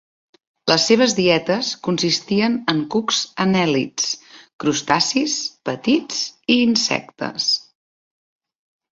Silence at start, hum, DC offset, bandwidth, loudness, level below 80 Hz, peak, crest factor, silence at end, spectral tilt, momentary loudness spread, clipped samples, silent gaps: 0.65 s; none; under 0.1%; 7.8 kHz; -19 LUFS; -60 dBFS; 0 dBFS; 20 dB; 1.3 s; -3.5 dB/octave; 8 LU; under 0.1%; 4.53-4.59 s